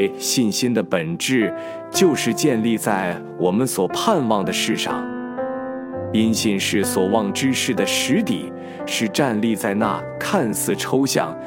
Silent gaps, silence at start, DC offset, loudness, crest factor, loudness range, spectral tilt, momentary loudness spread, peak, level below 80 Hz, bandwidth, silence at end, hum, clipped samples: none; 0 s; under 0.1%; -20 LUFS; 18 dB; 1 LU; -4 dB/octave; 8 LU; -2 dBFS; -60 dBFS; 17 kHz; 0 s; none; under 0.1%